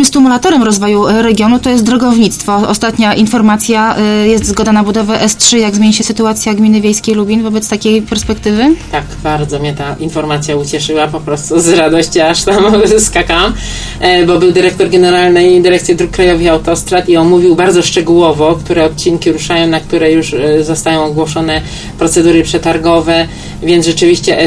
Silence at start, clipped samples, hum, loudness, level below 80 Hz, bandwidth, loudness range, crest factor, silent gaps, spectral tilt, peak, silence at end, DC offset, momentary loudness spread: 0 s; 0.4%; none; -9 LUFS; -30 dBFS; 11 kHz; 4 LU; 8 dB; none; -4 dB/octave; 0 dBFS; 0 s; under 0.1%; 7 LU